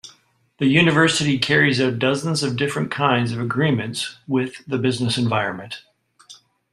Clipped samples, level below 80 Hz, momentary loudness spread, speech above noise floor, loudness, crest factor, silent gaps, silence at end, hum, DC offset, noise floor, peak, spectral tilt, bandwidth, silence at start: under 0.1%; -58 dBFS; 10 LU; 38 dB; -20 LUFS; 20 dB; none; 0.4 s; none; under 0.1%; -58 dBFS; -2 dBFS; -5 dB/octave; 13 kHz; 0.05 s